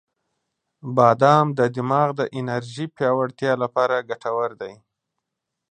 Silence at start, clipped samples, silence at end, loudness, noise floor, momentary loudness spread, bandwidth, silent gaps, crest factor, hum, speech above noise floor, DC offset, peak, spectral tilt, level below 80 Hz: 0.85 s; under 0.1%; 0.95 s; -21 LUFS; -82 dBFS; 12 LU; 9.4 kHz; none; 20 dB; none; 62 dB; under 0.1%; -2 dBFS; -7 dB/octave; -68 dBFS